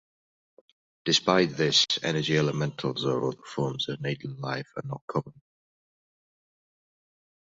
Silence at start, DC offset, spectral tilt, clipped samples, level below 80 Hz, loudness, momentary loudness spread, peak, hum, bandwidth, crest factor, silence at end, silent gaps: 1.05 s; under 0.1%; -4 dB/octave; under 0.1%; -66 dBFS; -27 LUFS; 12 LU; -6 dBFS; none; 7.8 kHz; 24 dB; 2.15 s; 5.01-5.08 s